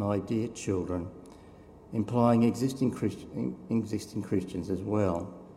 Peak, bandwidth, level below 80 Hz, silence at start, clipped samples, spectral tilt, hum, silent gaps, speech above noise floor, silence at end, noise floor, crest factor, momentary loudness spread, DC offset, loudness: -10 dBFS; 13.5 kHz; -60 dBFS; 0 s; under 0.1%; -7.5 dB/octave; none; none; 22 dB; 0 s; -52 dBFS; 20 dB; 11 LU; under 0.1%; -30 LUFS